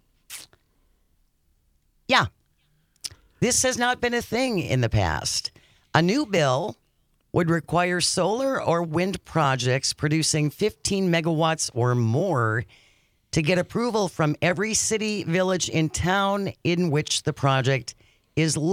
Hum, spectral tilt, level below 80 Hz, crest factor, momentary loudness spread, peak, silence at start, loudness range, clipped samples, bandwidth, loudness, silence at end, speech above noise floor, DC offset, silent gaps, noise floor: none; -4.5 dB/octave; -50 dBFS; 20 dB; 7 LU; -4 dBFS; 0.3 s; 2 LU; under 0.1%; 16 kHz; -23 LUFS; 0 s; 44 dB; under 0.1%; none; -67 dBFS